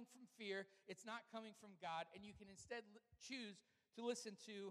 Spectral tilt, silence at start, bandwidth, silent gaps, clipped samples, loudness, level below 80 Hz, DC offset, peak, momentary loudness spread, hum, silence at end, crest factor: -3 dB/octave; 0 s; 14 kHz; none; under 0.1%; -53 LUFS; -84 dBFS; under 0.1%; -34 dBFS; 13 LU; none; 0 s; 20 dB